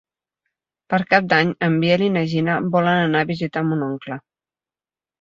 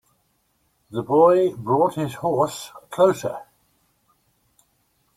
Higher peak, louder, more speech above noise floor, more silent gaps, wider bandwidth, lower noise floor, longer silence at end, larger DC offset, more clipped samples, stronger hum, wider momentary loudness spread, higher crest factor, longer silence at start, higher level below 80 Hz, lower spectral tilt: about the same, -2 dBFS vs -4 dBFS; about the same, -19 LUFS vs -21 LUFS; first, over 71 dB vs 48 dB; neither; second, 7.4 kHz vs 15.5 kHz; first, under -90 dBFS vs -68 dBFS; second, 1.05 s vs 1.75 s; neither; neither; neither; second, 9 LU vs 17 LU; about the same, 20 dB vs 20 dB; about the same, 0.9 s vs 0.9 s; about the same, -60 dBFS vs -62 dBFS; about the same, -7.5 dB/octave vs -6.5 dB/octave